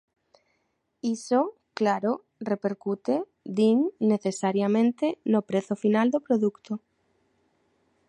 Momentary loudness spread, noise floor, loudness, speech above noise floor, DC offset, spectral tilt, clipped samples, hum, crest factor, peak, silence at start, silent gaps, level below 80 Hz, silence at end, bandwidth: 9 LU; -75 dBFS; -26 LUFS; 50 dB; under 0.1%; -6.5 dB/octave; under 0.1%; none; 16 dB; -10 dBFS; 1.05 s; none; -76 dBFS; 1.3 s; 10.5 kHz